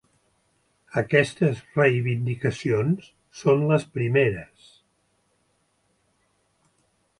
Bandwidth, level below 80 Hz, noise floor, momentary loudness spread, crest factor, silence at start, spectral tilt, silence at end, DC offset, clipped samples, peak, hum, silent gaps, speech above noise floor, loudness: 11.5 kHz; -60 dBFS; -69 dBFS; 8 LU; 20 dB; 0.95 s; -7 dB/octave; 2.75 s; under 0.1%; under 0.1%; -4 dBFS; none; none; 46 dB; -23 LUFS